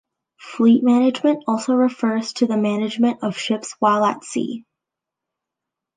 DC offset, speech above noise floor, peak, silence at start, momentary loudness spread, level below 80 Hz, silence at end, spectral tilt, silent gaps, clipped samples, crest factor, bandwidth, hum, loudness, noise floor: under 0.1%; 66 dB; -6 dBFS; 0.4 s; 10 LU; -72 dBFS; 1.35 s; -5 dB/octave; none; under 0.1%; 14 dB; 9.6 kHz; none; -19 LUFS; -85 dBFS